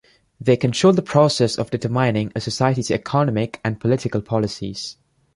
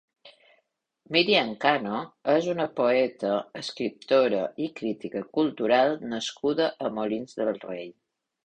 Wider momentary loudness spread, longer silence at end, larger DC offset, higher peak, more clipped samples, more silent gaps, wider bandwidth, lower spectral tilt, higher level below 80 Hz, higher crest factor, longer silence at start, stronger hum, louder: about the same, 9 LU vs 10 LU; about the same, 0.45 s vs 0.55 s; neither; first, -2 dBFS vs -6 dBFS; neither; neither; first, 11.5 kHz vs 9.4 kHz; first, -6 dB/octave vs -4.5 dB/octave; first, -52 dBFS vs -70 dBFS; about the same, 18 dB vs 20 dB; first, 0.4 s vs 0.25 s; neither; first, -20 LUFS vs -26 LUFS